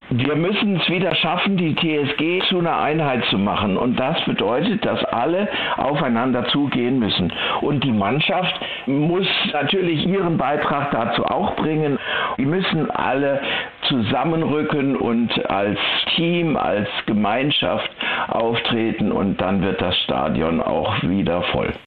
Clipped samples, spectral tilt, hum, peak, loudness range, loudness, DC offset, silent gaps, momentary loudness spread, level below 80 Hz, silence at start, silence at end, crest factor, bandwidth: under 0.1%; -9 dB/octave; none; -4 dBFS; 1 LU; -20 LUFS; 0.3%; none; 3 LU; -48 dBFS; 0 s; 0.05 s; 16 dB; 4.9 kHz